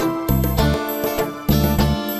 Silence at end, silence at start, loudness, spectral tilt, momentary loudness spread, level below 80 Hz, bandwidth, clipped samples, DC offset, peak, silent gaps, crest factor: 0 s; 0 s; -19 LUFS; -6 dB/octave; 5 LU; -26 dBFS; 14 kHz; under 0.1%; under 0.1%; -4 dBFS; none; 16 dB